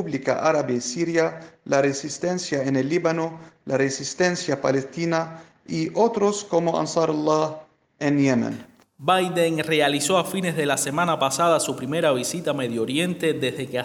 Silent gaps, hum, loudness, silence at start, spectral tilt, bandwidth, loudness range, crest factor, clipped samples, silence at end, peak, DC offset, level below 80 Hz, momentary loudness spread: none; none; -23 LUFS; 0 s; -4.5 dB/octave; 19.5 kHz; 3 LU; 18 dB; under 0.1%; 0 s; -6 dBFS; under 0.1%; -66 dBFS; 7 LU